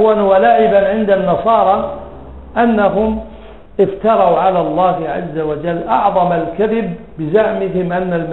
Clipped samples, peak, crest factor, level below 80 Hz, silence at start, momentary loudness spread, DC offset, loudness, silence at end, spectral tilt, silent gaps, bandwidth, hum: under 0.1%; 0 dBFS; 14 dB; -40 dBFS; 0 s; 13 LU; 0.8%; -14 LUFS; 0 s; -9.5 dB/octave; none; 4.2 kHz; none